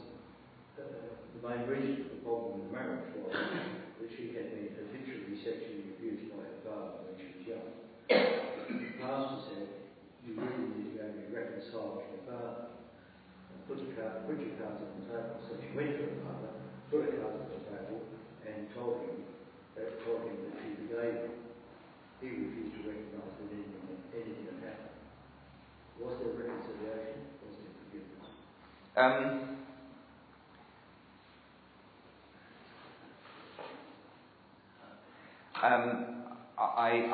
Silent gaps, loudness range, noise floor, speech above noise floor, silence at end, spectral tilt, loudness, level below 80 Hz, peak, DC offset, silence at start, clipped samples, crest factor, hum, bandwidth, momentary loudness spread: none; 11 LU; -60 dBFS; 23 dB; 0 s; -4 dB/octave; -39 LUFS; -72 dBFS; -12 dBFS; under 0.1%; 0 s; under 0.1%; 26 dB; none; 4.8 kHz; 23 LU